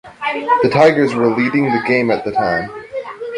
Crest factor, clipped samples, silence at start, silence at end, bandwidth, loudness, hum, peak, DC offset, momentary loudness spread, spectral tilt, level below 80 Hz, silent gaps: 14 dB; under 0.1%; 0.05 s; 0 s; 11 kHz; -15 LUFS; none; -2 dBFS; under 0.1%; 15 LU; -6.5 dB/octave; -52 dBFS; none